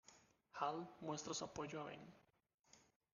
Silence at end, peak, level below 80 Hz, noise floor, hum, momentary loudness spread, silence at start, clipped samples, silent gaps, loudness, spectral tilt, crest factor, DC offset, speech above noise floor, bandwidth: 0.3 s; -28 dBFS; -82 dBFS; -71 dBFS; none; 14 LU; 0.05 s; under 0.1%; 2.54-2.58 s; -48 LUFS; -3.5 dB/octave; 24 dB; under 0.1%; 23 dB; 9.6 kHz